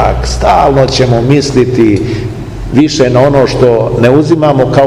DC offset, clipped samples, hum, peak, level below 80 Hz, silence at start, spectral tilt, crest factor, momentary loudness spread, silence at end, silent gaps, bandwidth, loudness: under 0.1%; 5%; none; 0 dBFS; -22 dBFS; 0 s; -6.5 dB/octave; 8 dB; 6 LU; 0 s; none; 12 kHz; -8 LUFS